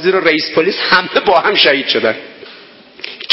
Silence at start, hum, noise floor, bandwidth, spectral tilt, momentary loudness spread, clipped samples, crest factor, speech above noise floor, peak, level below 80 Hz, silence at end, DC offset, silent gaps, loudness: 0 s; none; -39 dBFS; 7 kHz; -6 dB/octave; 18 LU; 0.1%; 14 dB; 26 dB; 0 dBFS; -54 dBFS; 0 s; under 0.1%; none; -12 LUFS